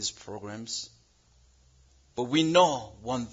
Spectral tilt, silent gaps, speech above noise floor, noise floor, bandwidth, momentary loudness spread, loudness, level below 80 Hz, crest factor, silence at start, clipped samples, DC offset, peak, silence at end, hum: -4 dB/octave; none; 35 dB; -63 dBFS; 7.8 kHz; 19 LU; -27 LUFS; -62 dBFS; 22 dB; 0 s; under 0.1%; under 0.1%; -8 dBFS; 0 s; none